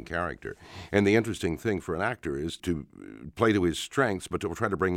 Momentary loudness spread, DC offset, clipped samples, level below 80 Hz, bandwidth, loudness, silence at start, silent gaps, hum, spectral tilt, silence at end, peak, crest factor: 16 LU; under 0.1%; under 0.1%; -54 dBFS; 16.5 kHz; -28 LUFS; 0 s; none; none; -5.5 dB/octave; 0 s; -8 dBFS; 22 dB